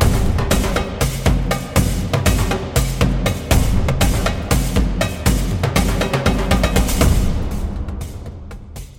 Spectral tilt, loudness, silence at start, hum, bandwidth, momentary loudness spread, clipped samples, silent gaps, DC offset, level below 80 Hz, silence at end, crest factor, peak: -5 dB/octave; -18 LUFS; 0 s; none; 17 kHz; 10 LU; under 0.1%; none; under 0.1%; -20 dBFS; 0.05 s; 16 dB; 0 dBFS